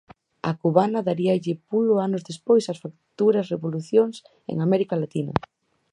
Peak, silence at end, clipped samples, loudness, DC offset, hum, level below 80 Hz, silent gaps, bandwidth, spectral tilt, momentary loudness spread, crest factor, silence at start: -2 dBFS; 0.55 s; under 0.1%; -23 LUFS; under 0.1%; none; -58 dBFS; none; 10.5 kHz; -7.5 dB/octave; 10 LU; 22 dB; 0.45 s